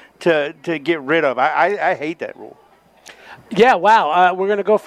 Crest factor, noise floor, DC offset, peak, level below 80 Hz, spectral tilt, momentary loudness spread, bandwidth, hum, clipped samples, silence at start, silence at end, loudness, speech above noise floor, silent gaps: 16 dB; -45 dBFS; under 0.1%; -2 dBFS; -64 dBFS; -5.5 dB/octave; 12 LU; 13 kHz; none; under 0.1%; 0.2 s; 0.05 s; -16 LUFS; 29 dB; none